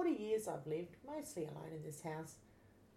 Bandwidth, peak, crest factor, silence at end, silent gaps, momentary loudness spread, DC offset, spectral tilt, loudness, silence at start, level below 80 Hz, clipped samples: 16 kHz; -28 dBFS; 16 dB; 0 s; none; 10 LU; under 0.1%; -6 dB/octave; -45 LUFS; 0 s; -76 dBFS; under 0.1%